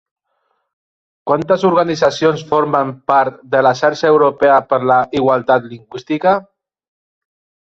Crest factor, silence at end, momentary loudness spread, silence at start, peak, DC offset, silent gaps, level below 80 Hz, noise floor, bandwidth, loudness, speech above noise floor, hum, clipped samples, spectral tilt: 14 dB; 1.2 s; 7 LU; 1.25 s; -2 dBFS; under 0.1%; none; -58 dBFS; -67 dBFS; 7.8 kHz; -14 LUFS; 53 dB; none; under 0.1%; -6 dB/octave